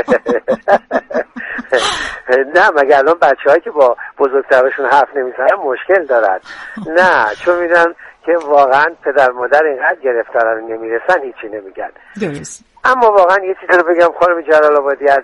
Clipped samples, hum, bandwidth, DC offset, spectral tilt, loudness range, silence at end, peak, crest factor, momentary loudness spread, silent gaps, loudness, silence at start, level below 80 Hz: under 0.1%; none; 11 kHz; under 0.1%; -4 dB/octave; 3 LU; 0 s; 0 dBFS; 12 dB; 13 LU; none; -12 LUFS; 0 s; -52 dBFS